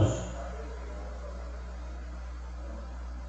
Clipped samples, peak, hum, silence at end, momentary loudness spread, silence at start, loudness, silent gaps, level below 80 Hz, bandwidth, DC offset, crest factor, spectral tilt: under 0.1%; -14 dBFS; 60 Hz at -40 dBFS; 0 s; 5 LU; 0 s; -40 LUFS; none; -40 dBFS; 8.4 kHz; under 0.1%; 22 dB; -6.5 dB/octave